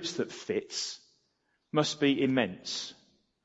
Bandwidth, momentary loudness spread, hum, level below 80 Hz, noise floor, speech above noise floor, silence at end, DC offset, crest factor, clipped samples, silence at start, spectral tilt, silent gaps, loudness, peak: 8 kHz; 10 LU; none; -78 dBFS; -76 dBFS; 45 dB; 0.5 s; under 0.1%; 22 dB; under 0.1%; 0 s; -4 dB/octave; none; -31 LUFS; -10 dBFS